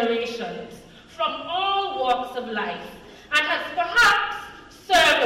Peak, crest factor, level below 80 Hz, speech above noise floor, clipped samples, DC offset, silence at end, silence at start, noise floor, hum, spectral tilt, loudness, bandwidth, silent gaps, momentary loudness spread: -8 dBFS; 14 dB; -54 dBFS; 23 dB; under 0.1%; under 0.1%; 0 s; 0 s; -45 dBFS; none; -1.5 dB/octave; -22 LUFS; 16 kHz; none; 20 LU